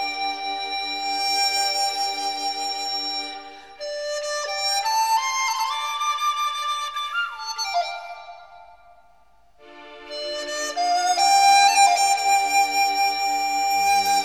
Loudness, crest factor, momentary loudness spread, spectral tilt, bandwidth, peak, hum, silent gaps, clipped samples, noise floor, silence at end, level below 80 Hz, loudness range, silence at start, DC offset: -21 LUFS; 18 dB; 14 LU; 1.5 dB/octave; 18.5 kHz; -6 dBFS; none; none; under 0.1%; -59 dBFS; 0 s; -66 dBFS; 12 LU; 0 s; 0.2%